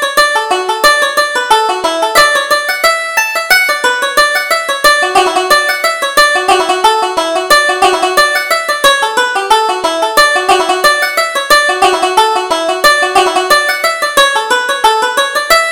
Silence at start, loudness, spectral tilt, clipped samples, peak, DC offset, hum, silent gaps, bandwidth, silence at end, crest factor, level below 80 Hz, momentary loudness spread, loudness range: 0 s; -9 LUFS; 0 dB/octave; 0.2%; 0 dBFS; under 0.1%; none; none; over 20 kHz; 0 s; 10 dB; -44 dBFS; 4 LU; 1 LU